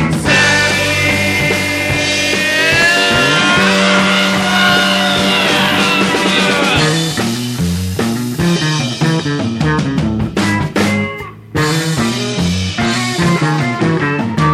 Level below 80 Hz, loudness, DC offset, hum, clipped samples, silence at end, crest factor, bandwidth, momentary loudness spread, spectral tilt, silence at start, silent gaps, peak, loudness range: -36 dBFS; -12 LUFS; under 0.1%; none; under 0.1%; 0 s; 12 dB; 15.5 kHz; 7 LU; -4 dB/octave; 0 s; none; 0 dBFS; 5 LU